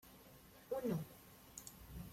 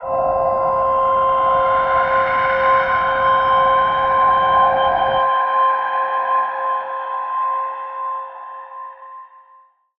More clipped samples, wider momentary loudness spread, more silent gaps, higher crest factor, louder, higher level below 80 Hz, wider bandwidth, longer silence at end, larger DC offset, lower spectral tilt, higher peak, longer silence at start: neither; first, 19 LU vs 12 LU; neither; first, 18 dB vs 12 dB; second, -47 LUFS vs -17 LUFS; second, -64 dBFS vs -48 dBFS; first, 16.5 kHz vs 5.6 kHz; second, 0 s vs 0.75 s; neither; about the same, -6 dB/octave vs -6 dB/octave; second, -30 dBFS vs -4 dBFS; about the same, 0.05 s vs 0 s